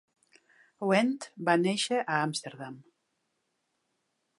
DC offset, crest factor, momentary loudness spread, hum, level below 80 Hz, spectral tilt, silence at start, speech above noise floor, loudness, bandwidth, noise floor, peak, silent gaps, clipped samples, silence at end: under 0.1%; 22 dB; 16 LU; none; -84 dBFS; -4.5 dB/octave; 0.8 s; 50 dB; -29 LUFS; 11.5 kHz; -79 dBFS; -10 dBFS; none; under 0.1%; 1.6 s